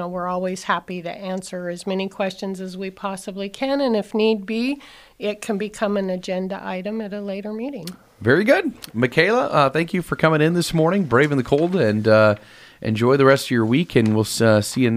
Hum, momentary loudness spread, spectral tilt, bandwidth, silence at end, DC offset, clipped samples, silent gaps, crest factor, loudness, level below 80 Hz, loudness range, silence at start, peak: none; 13 LU; -6 dB/octave; 15.5 kHz; 0 s; under 0.1%; under 0.1%; none; 18 dB; -20 LUFS; -54 dBFS; 9 LU; 0 s; -2 dBFS